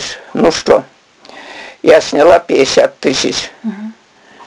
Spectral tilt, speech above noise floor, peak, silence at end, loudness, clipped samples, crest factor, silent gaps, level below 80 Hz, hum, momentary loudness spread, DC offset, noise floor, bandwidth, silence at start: -3.5 dB/octave; 27 dB; 0 dBFS; 0.05 s; -11 LUFS; 0.2%; 12 dB; none; -46 dBFS; none; 21 LU; under 0.1%; -37 dBFS; 11 kHz; 0 s